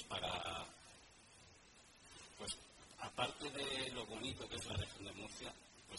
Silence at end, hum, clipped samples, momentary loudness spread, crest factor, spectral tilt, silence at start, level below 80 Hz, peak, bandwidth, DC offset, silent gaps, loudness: 0 s; none; under 0.1%; 20 LU; 24 dB; -3 dB/octave; 0 s; -66 dBFS; -24 dBFS; 11.5 kHz; under 0.1%; none; -46 LUFS